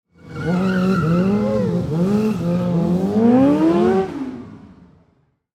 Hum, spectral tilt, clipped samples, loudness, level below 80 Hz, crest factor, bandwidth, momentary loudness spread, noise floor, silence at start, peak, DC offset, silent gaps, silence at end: none; -8.5 dB/octave; under 0.1%; -18 LUFS; -48 dBFS; 14 dB; 9.6 kHz; 13 LU; -61 dBFS; 0.25 s; -4 dBFS; under 0.1%; none; 0.9 s